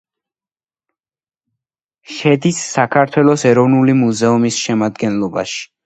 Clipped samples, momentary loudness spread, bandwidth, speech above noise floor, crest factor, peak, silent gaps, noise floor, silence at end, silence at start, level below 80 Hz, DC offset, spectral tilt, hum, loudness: under 0.1%; 8 LU; 9.2 kHz; over 76 dB; 16 dB; 0 dBFS; none; under -90 dBFS; 0.2 s; 2.1 s; -58 dBFS; under 0.1%; -5.5 dB/octave; none; -14 LUFS